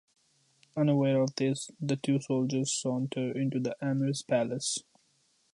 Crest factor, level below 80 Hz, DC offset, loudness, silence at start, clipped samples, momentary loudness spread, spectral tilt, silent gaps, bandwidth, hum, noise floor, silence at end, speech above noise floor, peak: 16 dB; -76 dBFS; under 0.1%; -30 LUFS; 0.75 s; under 0.1%; 6 LU; -5.5 dB/octave; none; 11.5 kHz; none; -71 dBFS; 0.7 s; 41 dB; -16 dBFS